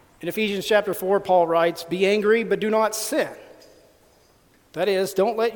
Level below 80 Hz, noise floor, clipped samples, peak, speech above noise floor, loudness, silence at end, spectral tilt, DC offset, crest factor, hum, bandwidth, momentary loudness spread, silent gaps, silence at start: -64 dBFS; -58 dBFS; under 0.1%; -4 dBFS; 36 dB; -22 LUFS; 0 s; -4 dB/octave; under 0.1%; 18 dB; none; 19 kHz; 7 LU; none; 0.2 s